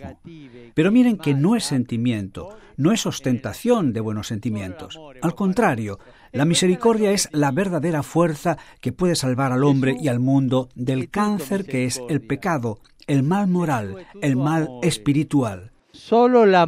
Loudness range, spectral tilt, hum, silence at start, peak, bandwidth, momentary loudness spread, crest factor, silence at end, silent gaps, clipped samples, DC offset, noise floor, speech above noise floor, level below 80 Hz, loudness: 3 LU; -6 dB/octave; none; 0 s; -4 dBFS; 16 kHz; 11 LU; 18 dB; 0 s; none; under 0.1%; under 0.1%; -41 dBFS; 21 dB; -52 dBFS; -21 LUFS